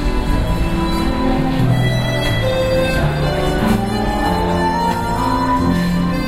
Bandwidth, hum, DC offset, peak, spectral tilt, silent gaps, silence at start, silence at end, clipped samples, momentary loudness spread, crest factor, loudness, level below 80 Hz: 16 kHz; none; under 0.1%; -4 dBFS; -6.5 dB/octave; none; 0 s; 0 s; under 0.1%; 3 LU; 12 dB; -17 LUFS; -24 dBFS